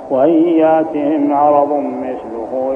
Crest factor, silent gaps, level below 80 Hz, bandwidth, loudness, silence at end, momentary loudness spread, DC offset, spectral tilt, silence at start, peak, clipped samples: 14 dB; none; -56 dBFS; 3.5 kHz; -14 LUFS; 0 s; 12 LU; under 0.1%; -9 dB/octave; 0 s; 0 dBFS; under 0.1%